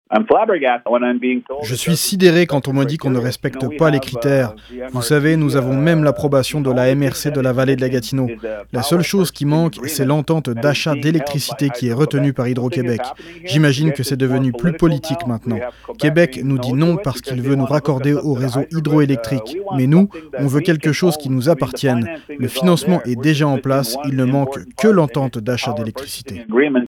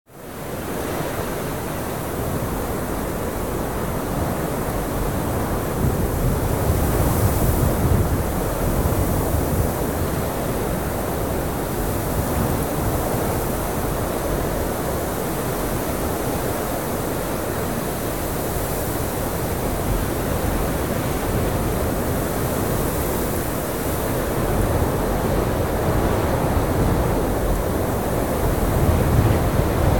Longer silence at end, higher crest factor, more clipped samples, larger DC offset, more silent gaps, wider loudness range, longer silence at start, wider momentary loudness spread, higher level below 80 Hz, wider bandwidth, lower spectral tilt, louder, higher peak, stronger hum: about the same, 0 s vs 0 s; about the same, 16 dB vs 16 dB; neither; second, under 0.1% vs 0.9%; neither; about the same, 2 LU vs 4 LU; about the same, 0.1 s vs 0.05 s; first, 8 LU vs 5 LU; second, -48 dBFS vs -30 dBFS; about the same, 18 kHz vs 18 kHz; about the same, -6 dB/octave vs -6 dB/octave; first, -17 LUFS vs -22 LUFS; first, 0 dBFS vs -4 dBFS; neither